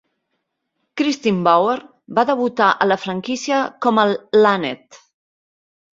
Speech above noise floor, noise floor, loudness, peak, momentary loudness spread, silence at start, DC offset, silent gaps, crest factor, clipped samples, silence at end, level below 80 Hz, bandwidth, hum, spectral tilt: 57 dB; -74 dBFS; -18 LUFS; -2 dBFS; 9 LU; 0.95 s; under 0.1%; none; 18 dB; under 0.1%; 0.95 s; -66 dBFS; 7.6 kHz; none; -5 dB/octave